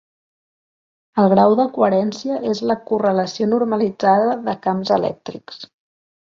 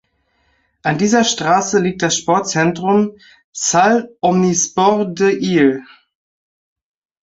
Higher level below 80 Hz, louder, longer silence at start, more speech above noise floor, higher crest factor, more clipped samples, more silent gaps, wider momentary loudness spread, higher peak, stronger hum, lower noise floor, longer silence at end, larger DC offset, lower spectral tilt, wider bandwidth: second, -62 dBFS vs -56 dBFS; second, -18 LUFS vs -15 LUFS; first, 1.15 s vs 0.85 s; first, over 72 dB vs 48 dB; about the same, 18 dB vs 16 dB; neither; second, none vs 3.44-3.53 s; first, 13 LU vs 6 LU; about the same, -2 dBFS vs 0 dBFS; neither; first, under -90 dBFS vs -63 dBFS; second, 0.55 s vs 1.4 s; neither; first, -7 dB/octave vs -4 dB/octave; about the same, 7.4 kHz vs 8 kHz